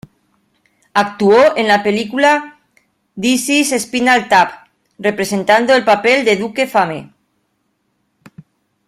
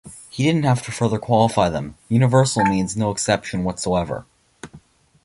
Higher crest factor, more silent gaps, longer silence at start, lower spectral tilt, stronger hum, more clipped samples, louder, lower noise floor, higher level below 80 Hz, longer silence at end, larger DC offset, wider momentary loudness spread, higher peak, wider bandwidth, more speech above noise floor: about the same, 14 dB vs 18 dB; neither; first, 0.95 s vs 0.05 s; second, -3.5 dB/octave vs -5.5 dB/octave; neither; neither; first, -13 LUFS vs -20 LUFS; first, -66 dBFS vs -48 dBFS; second, -58 dBFS vs -46 dBFS; first, 1.85 s vs 0.45 s; neither; about the same, 8 LU vs 9 LU; about the same, 0 dBFS vs -2 dBFS; first, 16 kHz vs 11.5 kHz; first, 53 dB vs 29 dB